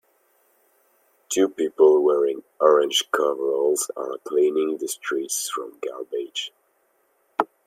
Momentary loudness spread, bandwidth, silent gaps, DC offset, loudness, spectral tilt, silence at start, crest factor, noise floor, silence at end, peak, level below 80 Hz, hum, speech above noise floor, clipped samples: 14 LU; 16 kHz; none; under 0.1%; -22 LUFS; -1.5 dB/octave; 1.3 s; 20 dB; -66 dBFS; 0.2 s; -2 dBFS; -78 dBFS; none; 45 dB; under 0.1%